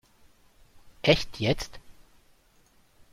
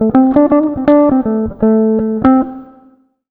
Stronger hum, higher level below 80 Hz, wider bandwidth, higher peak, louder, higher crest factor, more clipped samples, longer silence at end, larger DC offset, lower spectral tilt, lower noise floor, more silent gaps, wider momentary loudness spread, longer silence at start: neither; second, -46 dBFS vs -38 dBFS; first, 15.5 kHz vs 4.1 kHz; second, -6 dBFS vs 0 dBFS; second, -27 LUFS vs -11 LUFS; first, 26 dB vs 12 dB; neither; first, 1.2 s vs 0.65 s; neither; second, -5 dB/octave vs -11 dB/octave; first, -62 dBFS vs -48 dBFS; neither; first, 9 LU vs 5 LU; first, 0.85 s vs 0 s